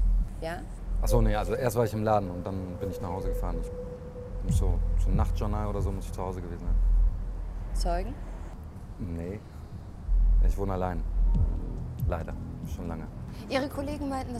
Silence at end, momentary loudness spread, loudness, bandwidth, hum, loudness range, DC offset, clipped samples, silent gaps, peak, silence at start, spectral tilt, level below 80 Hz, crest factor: 0 s; 13 LU; -31 LUFS; 13.5 kHz; none; 4 LU; under 0.1%; under 0.1%; none; -10 dBFS; 0 s; -7 dB/octave; -30 dBFS; 18 dB